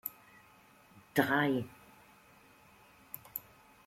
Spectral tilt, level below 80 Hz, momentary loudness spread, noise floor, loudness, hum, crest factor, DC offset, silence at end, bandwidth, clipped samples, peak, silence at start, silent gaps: -5.5 dB/octave; -74 dBFS; 19 LU; -62 dBFS; -34 LUFS; none; 26 dB; under 0.1%; 0.45 s; 16.5 kHz; under 0.1%; -12 dBFS; 0.05 s; none